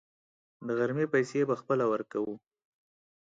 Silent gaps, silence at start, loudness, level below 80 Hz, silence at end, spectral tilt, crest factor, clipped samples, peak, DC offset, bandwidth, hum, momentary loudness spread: none; 0.6 s; -30 LUFS; -80 dBFS; 0.85 s; -7 dB/octave; 18 dB; under 0.1%; -14 dBFS; under 0.1%; 7.8 kHz; none; 10 LU